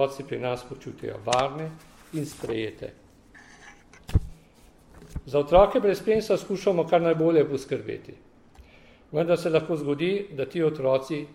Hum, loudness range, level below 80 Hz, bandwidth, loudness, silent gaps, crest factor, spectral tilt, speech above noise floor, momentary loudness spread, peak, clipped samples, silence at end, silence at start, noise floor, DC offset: none; 11 LU; -44 dBFS; 16 kHz; -25 LUFS; none; 20 dB; -6.5 dB/octave; 30 dB; 16 LU; -6 dBFS; under 0.1%; 0 s; 0 s; -54 dBFS; under 0.1%